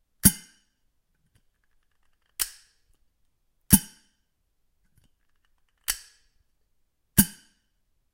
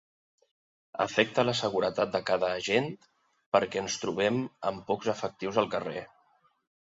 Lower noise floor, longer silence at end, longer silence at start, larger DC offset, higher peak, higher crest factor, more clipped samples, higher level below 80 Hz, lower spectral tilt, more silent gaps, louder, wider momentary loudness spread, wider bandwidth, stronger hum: first, -73 dBFS vs -68 dBFS; about the same, 0.85 s vs 0.85 s; second, 0.25 s vs 0.95 s; neither; first, 0 dBFS vs -8 dBFS; first, 32 dB vs 22 dB; neither; first, -46 dBFS vs -66 dBFS; about the same, -3 dB/octave vs -4 dB/octave; second, none vs 3.46-3.52 s; first, -24 LUFS vs -29 LUFS; first, 18 LU vs 8 LU; first, 16 kHz vs 7.8 kHz; neither